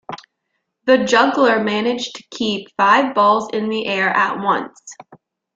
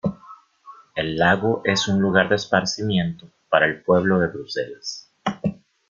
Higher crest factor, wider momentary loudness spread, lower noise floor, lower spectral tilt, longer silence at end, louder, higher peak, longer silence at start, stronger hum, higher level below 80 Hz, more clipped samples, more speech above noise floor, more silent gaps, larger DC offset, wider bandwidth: about the same, 16 dB vs 20 dB; about the same, 12 LU vs 11 LU; first, -74 dBFS vs -47 dBFS; about the same, -4 dB/octave vs -5 dB/octave; about the same, 0.4 s vs 0.35 s; first, -17 LUFS vs -21 LUFS; about the same, -2 dBFS vs -2 dBFS; about the same, 0.1 s vs 0.05 s; neither; second, -64 dBFS vs -56 dBFS; neither; first, 57 dB vs 27 dB; neither; neither; about the same, 7.8 kHz vs 7.4 kHz